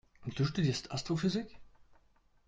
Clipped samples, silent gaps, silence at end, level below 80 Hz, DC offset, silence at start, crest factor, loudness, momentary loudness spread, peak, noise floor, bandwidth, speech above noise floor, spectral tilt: under 0.1%; none; 0.55 s; -60 dBFS; under 0.1%; 0.2 s; 16 dB; -35 LUFS; 10 LU; -22 dBFS; -68 dBFS; 8.8 kHz; 34 dB; -6 dB/octave